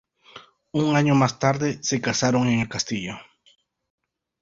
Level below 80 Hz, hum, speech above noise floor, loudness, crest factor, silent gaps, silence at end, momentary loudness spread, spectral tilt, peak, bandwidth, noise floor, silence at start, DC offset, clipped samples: -56 dBFS; none; 26 dB; -22 LUFS; 20 dB; none; 1.2 s; 11 LU; -5 dB/octave; -4 dBFS; 7.8 kHz; -48 dBFS; 0.35 s; under 0.1%; under 0.1%